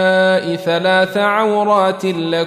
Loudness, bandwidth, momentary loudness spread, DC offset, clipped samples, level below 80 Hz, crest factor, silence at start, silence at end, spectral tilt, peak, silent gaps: -15 LUFS; 14.5 kHz; 4 LU; under 0.1%; under 0.1%; -64 dBFS; 12 dB; 0 s; 0 s; -5.5 dB/octave; -2 dBFS; none